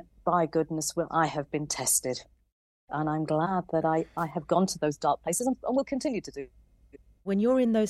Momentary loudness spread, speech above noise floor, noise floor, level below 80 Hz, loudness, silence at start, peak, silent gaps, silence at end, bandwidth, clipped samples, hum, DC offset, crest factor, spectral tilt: 10 LU; 28 dB; -56 dBFS; -60 dBFS; -28 LUFS; 0.25 s; -10 dBFS; 2.52-2.88 s; 0 s; 15.5 kHz; under 0.1%; none; under 0.1%; 18 dB; -4.5 dB/octave